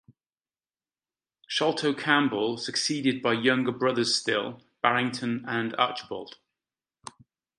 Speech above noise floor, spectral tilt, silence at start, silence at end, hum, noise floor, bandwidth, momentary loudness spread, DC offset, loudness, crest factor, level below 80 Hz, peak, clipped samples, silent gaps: over 63 dB; -3.5 dB/octave; 1.5 s; 1.3 s; none; under -90 dBFS; 11.5 kHz; 15 LU; under 0.1%; -26 LUFS; 24 dB; -74 dBFS; -4 dBFS; under 0.1%; none